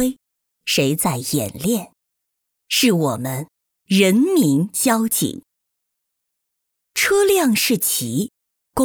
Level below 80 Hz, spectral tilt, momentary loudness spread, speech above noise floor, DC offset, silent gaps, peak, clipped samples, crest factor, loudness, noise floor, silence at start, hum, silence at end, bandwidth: -54 dBFS; -4 dB/octave; 12 LU; 60 dB; under 0.1%; none; -2 dBFS; under 0.1%; 18 dB; -18 LUFS; -78 dBFS; 0 s; none; 0 s; over 20 kHz